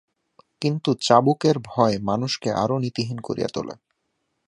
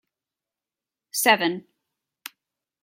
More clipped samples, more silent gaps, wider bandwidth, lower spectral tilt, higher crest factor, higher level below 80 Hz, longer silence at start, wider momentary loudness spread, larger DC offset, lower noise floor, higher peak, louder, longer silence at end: neither; neither; second, 11 kHz vs 16.5 kHz; first, -6 dB/octave vs -2 dB/octave; about the same, 22 dB vs 24 dB; first, -58 dBFS vs -82 dBFS; second, 0.6 s vs 1.15 s; second, 11 LU vs 23 LU; neither; second, -75 dBFS vs -90 dBFS; about the same, -2 dBFS vs -4 dBFS; about the same, -22 LUFS vs -21 LUFS; second, 0.75 s vs 1.2 s